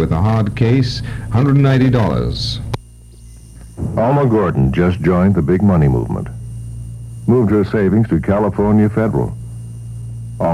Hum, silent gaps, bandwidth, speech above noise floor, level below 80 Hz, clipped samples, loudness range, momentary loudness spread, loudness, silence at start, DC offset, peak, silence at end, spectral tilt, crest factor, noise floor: none; none; 11.5 kHz; 25 dB; -32 dBFS; under 0.1%; 2 LU; 16 LU; -15 LUFS; 0 s; under 0.1%; -2 dBFS; 0 s; -8 dB/octave; 14 dB; -38 dBFS